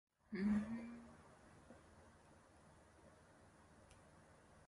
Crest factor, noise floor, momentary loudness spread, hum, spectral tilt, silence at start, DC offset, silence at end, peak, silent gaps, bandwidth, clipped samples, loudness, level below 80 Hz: 20 dB; -67 dBFS; 26 LU; none; -7.5 dB/octave; 0.3 s; under 0.1%; 0.05 s; -30 dBFS; none; 11.5 kHz; under 0.1%; -44 LUFS; -72 dBFS